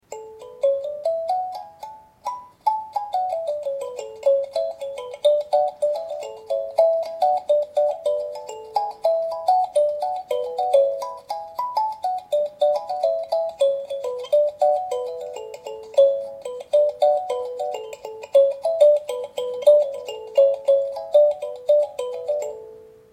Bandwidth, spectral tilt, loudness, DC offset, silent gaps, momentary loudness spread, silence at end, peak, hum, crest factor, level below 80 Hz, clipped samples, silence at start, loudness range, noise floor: 13 kHz; -2.5 dB/octave; -22 LUFS; under 0.1%; none; 15 LU; 0.3 s; -4 dBFS; none; 18 dB; -70 dBFS; under 0.1%; 0.1 s; 6 LU; -43 dBFS